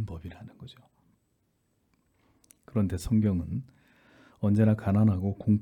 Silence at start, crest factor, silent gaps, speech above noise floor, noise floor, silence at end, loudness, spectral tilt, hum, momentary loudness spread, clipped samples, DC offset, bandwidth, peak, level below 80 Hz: 0 s; 16 dB; none; 47 dB; -73 dBFS; 0 s; -27 LUFS; -9 dB/octave; none; 23 LU; under 0.1%; under 0.1%; 12 kHz; -12 dBFS; -52 dBFS